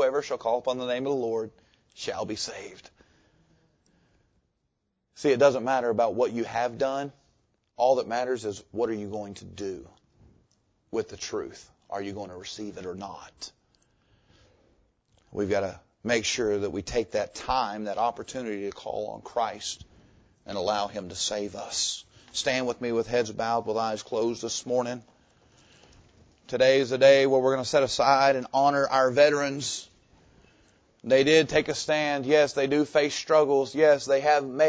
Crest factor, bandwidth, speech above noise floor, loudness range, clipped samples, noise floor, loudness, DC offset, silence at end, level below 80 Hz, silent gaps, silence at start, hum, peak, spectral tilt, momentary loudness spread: 22 dB; 8 kHz; 52 dB; 14 LU; under 0.1%; -77 dBFS; -26 LUFS; under 0.1%; 0 s; -58 dBFS; none; 0 s; none; -6 dBFS; -3.5 dB/octave; 16 LU